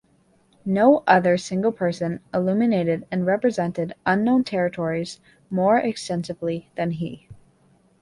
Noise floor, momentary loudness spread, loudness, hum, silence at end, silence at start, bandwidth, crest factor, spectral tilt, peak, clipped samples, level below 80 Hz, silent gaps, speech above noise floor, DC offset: -61 dBFS; 12 LU; -22 LUFS; none; 0.7 s; 0.65 s; 11.5 kHz; 20 dB; -6.5 dB/octave; -2 dBFS; under 0.1%; -60 dBFS; none; 39 dB; under 0.1%